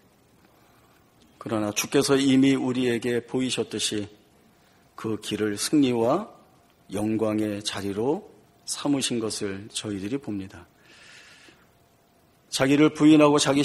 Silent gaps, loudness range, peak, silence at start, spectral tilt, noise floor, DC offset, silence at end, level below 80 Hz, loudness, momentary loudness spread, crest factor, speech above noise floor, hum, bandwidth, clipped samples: none; 6 LU; -6 dBFS; 1.45 s; -4.5 dB/octave; -61 dBFS; under 0.1%; 0 s; -62 dBFS; -24 LUFS; 14 LU; 20 dB; 37 dB; none; 14 kHz; under 0.1%